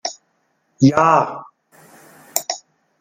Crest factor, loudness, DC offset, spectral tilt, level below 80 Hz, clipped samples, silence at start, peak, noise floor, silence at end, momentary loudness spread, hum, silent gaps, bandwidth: 20 dB; -17 LUFS; under 0.1%; -5 dB/octave; -62 dBFS; under 0.1%; 0.05 s; 0 dBFS; -66 dBFS; 0.45 s; 17 LU; none; none; 16.5 kHz